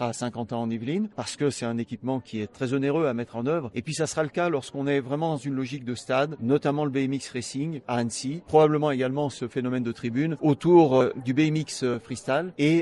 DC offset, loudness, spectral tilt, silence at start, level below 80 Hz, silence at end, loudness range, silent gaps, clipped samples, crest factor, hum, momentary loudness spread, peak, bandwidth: under 0.1%; -26 LUFS; -6 dB/octave; 0 s; -64 dBFS; 0 s; 5 LU; none; under 0.1%; 20 dB; none; 10 LU; -6 dBFS; 11.5 kHz